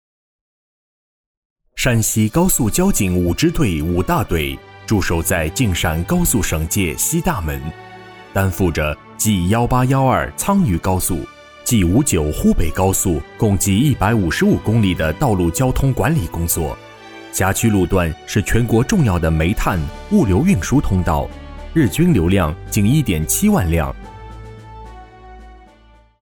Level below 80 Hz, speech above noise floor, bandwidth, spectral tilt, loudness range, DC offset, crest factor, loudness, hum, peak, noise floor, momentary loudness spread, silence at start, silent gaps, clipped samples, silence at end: -28 dBFS; 32 dB; over 20 kHz; -5.5 dB/octave; 3 LU; under 0.1%; 14 dB; -17 LUFS; none; -4 dBFS; -48 dBFS; 11 LU; 1.75 s; none; under 0.1%; 0.7 s